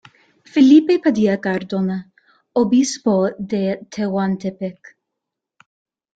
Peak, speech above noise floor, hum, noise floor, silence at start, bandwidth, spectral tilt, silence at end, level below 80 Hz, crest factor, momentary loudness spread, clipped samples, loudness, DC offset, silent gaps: -2 dBFS; 65 dB; none; -82 dBFS; 0.55 s; 9 kHz; -6 dB/octave; 1.45 s; -60 dBFS; 16 dB; 13 LU; under 0.1%; -18 LUFS; under 0.1%; none